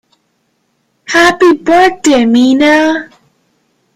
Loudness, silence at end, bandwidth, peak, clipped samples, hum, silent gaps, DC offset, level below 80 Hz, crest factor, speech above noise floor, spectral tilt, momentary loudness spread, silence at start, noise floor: -8 LUFS; 0.9 s; 15 kHz; 0 dBFS; under 0.1%; none; none; under 0.1%; -46 dBFS; 10 dB; 53 dB; -3 dB/octave; 6 LU; 1.1 s; -61 dBFS